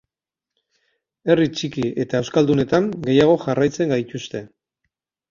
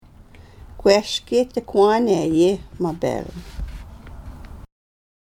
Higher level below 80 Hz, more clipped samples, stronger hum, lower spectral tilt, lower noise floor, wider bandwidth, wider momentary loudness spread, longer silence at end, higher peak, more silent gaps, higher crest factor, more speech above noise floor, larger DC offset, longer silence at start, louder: second, -54 dBFS vs -40 dBFS; neither; neither; about the same, -6.5 dB/octave vs -5.5 dB/octave; first, -88 dBFS vs -45 dBFS; second, 7.6 kHz vs 15 kHz; second, 13 LU vs 23 LU; first, 0.85 s vs 0.65 s; about the same, -2 dBFS vs -2 dBFS; neither; about the same, 18 dB vs 20 dB; first, 69 dB vs 26 dB; neither; first, 1.25 s vs 0.2 s; about the same, -19 LUFS vs -19 LUFS